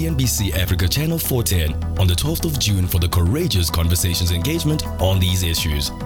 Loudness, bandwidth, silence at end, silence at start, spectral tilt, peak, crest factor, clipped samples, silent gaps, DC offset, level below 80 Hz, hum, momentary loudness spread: -19 LUFS; 17.5 kHz; 0 s; 0 s; -4.5 dB/octave; -6 dBFS; 12 dB; under 0.1%; none; under 0.1%; -28 dBFS; none; 2 LU